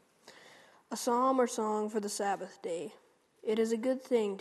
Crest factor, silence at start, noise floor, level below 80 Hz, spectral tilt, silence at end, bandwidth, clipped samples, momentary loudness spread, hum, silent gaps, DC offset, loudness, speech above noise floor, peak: 18 dB; 0.25 s; -59 dBFS; -86 dBFS; -4 dB/octave; 0 s; 13 kHz; under 0.1%; 12 LU; none; none; under 0.1%; -33 LUFS; 27 dB; -16 dBFS